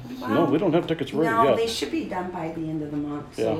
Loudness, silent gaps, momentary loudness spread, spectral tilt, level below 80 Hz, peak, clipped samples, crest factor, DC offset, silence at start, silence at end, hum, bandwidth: -24 LUFS; none; 10 LU; -6 dB/octave; -54 dBFS; -8 dBFS; under 0.1%; 16 dB; under 0.1%; 0 s; 0 s; none; 15.5 kHz